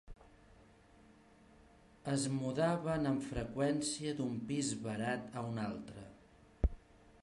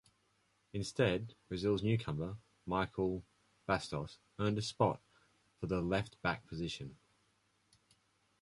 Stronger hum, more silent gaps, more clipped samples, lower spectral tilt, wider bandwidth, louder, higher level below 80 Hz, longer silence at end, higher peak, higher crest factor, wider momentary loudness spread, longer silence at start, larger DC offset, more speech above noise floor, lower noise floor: neither; neither; neither; about the same, -5.5 dB/octave vs -6 dB/octave; about the same, 11.5 kHz vs 11.5 kHz; about the same, -38 LUFS vs -38 LUFS; first, -50 dBFS vs -60 dBFS; second, 0.45 s vs 1.45 s; about the same, -18 dBFS vs -16 dBFS; about the same, 22 dB vs 22 dB; second, 10 LU vs 13 LU; second, 0.05 s vs 0.75 s; neither; second, 26 dB vs 39 dB; second, -63 dBFS vs -76 dBFS